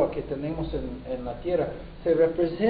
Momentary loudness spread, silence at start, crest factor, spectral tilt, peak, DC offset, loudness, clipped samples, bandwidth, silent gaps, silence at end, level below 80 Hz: 11 LU; 0 s; 18 dB; -11.5 dB/octave; -10 dBFS; under 0.1%; -28 LUFS; under 0.1%; 4.9 kHz; none; 0 s; -42 dBFS